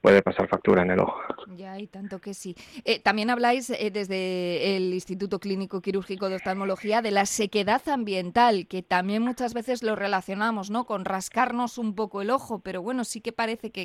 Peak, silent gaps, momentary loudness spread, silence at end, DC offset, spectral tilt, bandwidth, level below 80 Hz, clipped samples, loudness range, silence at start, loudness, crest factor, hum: -6 dBFS; none; 13 LU; 0 s; under 0.1%; -4.5 dB/octave; 15.5 kHz; -60 dBFS; under 0.1%; 3 LU; 0.05 s; -26 LUFS; 20 dB; none